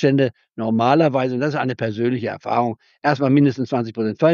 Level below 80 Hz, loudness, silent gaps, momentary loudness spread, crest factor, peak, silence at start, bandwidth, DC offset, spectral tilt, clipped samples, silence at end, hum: -68 dBFS; -20 LUFS; none; 8 LU; 16 dB; -2 dBFS; 0 s; 7 kHz; under 0.1%; -6 dB/octave; under 0.1%; 0 s; none